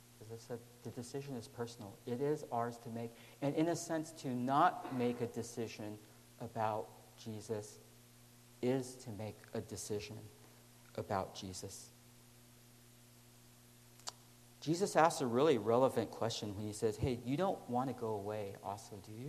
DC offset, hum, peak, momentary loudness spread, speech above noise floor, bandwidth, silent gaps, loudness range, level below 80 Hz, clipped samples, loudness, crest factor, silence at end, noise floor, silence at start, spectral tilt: under 0.1%; 60 Hz at -65 dBFS; -14 dBFS; 18 LU; 24 dB; 13 kHz; none; 12 LU; -68 dBFS; under 0.1%; -39 LUFS; 24 dB; 0 s; -62 dBFS; 0.05 s; -5.5 dB/octave